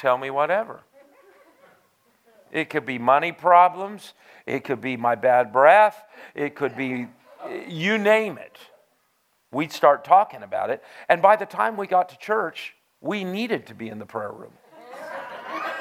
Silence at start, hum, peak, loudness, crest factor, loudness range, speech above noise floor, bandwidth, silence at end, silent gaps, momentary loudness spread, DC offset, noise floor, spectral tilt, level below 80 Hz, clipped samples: 0 s; none; -2 dBFS; -22 LUFS; 22 dB; 8 LU; 46 dB; 15.5 kHz; 0 s; none; 20 LU; under 0.1%; -68 dBFS; -5.5 dB/octave; -78 dBFS; under 0.1%